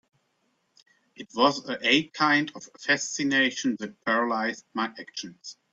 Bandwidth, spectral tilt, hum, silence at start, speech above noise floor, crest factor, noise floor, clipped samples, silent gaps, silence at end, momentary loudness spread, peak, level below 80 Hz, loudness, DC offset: 8 kHz; -3 dB/octave; none; 1.2 s; 46 dB; 22 dB; -73 dBFS; under 0.1%; none; 0.2 s; 15 LU; -6 dBFS; -72 dBFS; -25 LUFS; under 0.1%